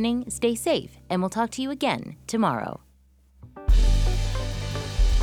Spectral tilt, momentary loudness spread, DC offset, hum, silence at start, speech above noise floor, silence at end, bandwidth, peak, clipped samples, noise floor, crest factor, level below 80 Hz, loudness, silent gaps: -5.5 dB/octave; 8 LU; under 0.1%; none; 0 s; 32 dB; 0 s; 13.5 kHz; -8 dBFS; under 0.1%; -58 dBFS; 16 dB; -26 dBFS; -26 LUFS; none